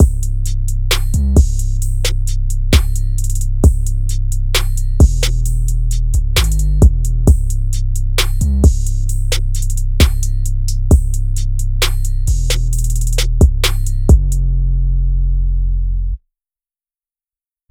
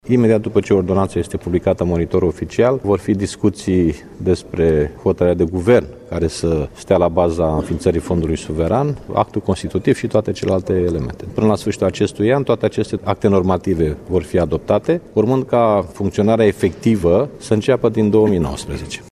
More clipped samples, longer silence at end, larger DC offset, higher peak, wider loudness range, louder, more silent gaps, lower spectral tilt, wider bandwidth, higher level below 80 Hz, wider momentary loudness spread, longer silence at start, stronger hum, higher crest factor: neither; first, 1.55 s vs 0.05 s; neither; about the same, 0 dBFS vs 0 dBFS; about the same, 2 LU vs 2 LU; about the same, -16 LUFS vs -17 LUFS; neither; second, -5 dB/octave vs -7 dB/octave; first, 17.5 kHz vs 13 kHz; first, -14 dBFS vs -36 dBFS; about the same, 7 LU vs 6 LU; about the same, 0 s vs 0.05 s; neither; about the same, 12 dB vs 16 dB